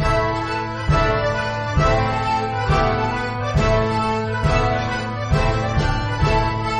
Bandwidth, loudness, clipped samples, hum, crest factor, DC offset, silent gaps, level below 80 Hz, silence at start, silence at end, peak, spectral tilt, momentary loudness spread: 10 kHz; -20 LUFS; under 0.1%; none; 16 dB; under 0.1%; none; -28 dBFS; 0 s; 0 s; -4 dBFS; -6 dB/octave; 4 LU